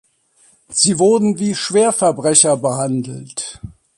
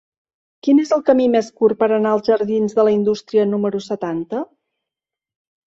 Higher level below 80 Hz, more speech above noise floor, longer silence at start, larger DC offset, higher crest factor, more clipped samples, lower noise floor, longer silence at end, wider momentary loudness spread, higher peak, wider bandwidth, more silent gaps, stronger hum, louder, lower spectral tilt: first, -52 dBFS vs -62 dBFS; second, 39 dB vs 70 dB; about the same, 0.7 s vs 0.65 s; neither; about the same, 16 dB vs 16 dB; neither; second, -55 dBFS vs -87 dBFS; second, 0.3 s vs 1.25 s; first, 15 LU vs 9 LU; about the same, 0 dBFS vs -2 dBFS; first, 11.5 kHz vs 7.8 kHz; neither; neither; about the same, -15 LUFS vs -17 LUFS; second, -3.5 dB/octave vs -6.5 dB/octave